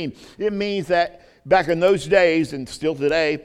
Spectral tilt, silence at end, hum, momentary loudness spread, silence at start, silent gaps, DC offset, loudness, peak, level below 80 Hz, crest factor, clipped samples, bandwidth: -5.5 dB/octave; 0.05 s; none; 10 LU; 0 s; none; under 0.1%; -20 LUFS; -4 dBFS; -50 dBFS; 16 dB; under 0.1%; 13.5 kHz